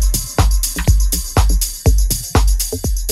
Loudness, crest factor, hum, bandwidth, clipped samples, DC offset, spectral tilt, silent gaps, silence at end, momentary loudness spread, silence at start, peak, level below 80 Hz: -17 LUFS; 14 dB; none; 16.5 kHz; under 0.1%; under 0.1%; -4 dB/octave; none; 0 s; 2 LU; 0 s; 0 dBFS; -16 dBFS